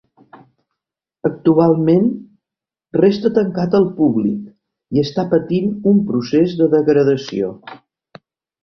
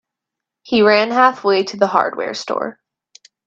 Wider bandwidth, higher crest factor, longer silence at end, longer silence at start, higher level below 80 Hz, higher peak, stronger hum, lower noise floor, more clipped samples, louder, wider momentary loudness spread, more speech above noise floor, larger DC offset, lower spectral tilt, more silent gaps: second, 6.4 kHz vs 7.6 kHz; about the same, 16 dB vs 18 dB; first, 0.9 s vs 0.75 s; first, 1.25 s vs 0.65 s; first, -56 dBFS vs -62 dBFS; about the same, -2 dBFS vs 0 dBFS; neither; first, -87 dBFS vs -83 dBFS; neither; about the same, -16 LUFS vs -16 LUFS; about the same, 10 LU vs 11 LU; first, 72 dB vs 68 dB; neither; first, -8.5 dB/octave vs -4.5 dB/octave; neither